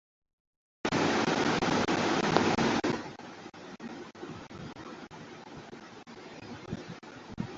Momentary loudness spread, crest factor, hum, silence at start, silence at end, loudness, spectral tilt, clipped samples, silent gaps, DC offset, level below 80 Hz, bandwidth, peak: 20 LU; 28 dB; none; 0.85 s; 0 s; -29 LUFS; -4.5 dB/octave; under 0.1%; none; under 0.1%; -60 dBFS; 8 kHz; -6 dBFS